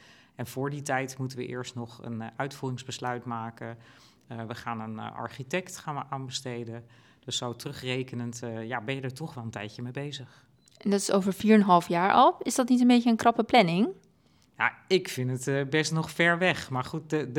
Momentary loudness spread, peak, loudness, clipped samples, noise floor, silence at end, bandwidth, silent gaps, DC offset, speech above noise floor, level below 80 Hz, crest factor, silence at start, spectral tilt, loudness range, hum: 17 LU; -6 dBFS; -28 LUFS; under 0.1%; -63 dBFS; 0 s; 17.5 kHz; none; under 0.1%; 36 dB; -70 dBFS; 22 dB; 0.4 s; -5 dB/octave; 13 LU; none